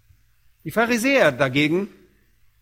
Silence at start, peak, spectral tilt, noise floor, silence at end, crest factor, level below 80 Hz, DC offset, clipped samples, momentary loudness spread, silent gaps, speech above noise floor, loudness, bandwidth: 0.65 s; -4 dBFS; -5 dB/octave; -60 dBFS; 0.75 s; 20 dB; -58 dBFS; under 0.1%; under 0.1%; 14 LU; none; 40 dB; -20 LUFS; 16.5 kHz